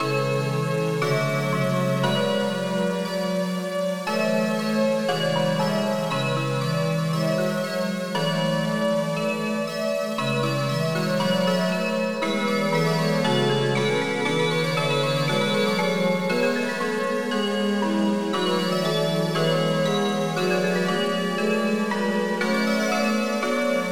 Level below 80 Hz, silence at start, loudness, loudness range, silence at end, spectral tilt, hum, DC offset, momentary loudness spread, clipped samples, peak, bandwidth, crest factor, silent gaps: -68 dBFS; 0 s; -23 LUFS; 2 LU; 0 s; -5.5 dB/octave; none; 0.4%; 3 LU; under 0.1%; -10 dBFS; over 20 kHz; 14 dB; none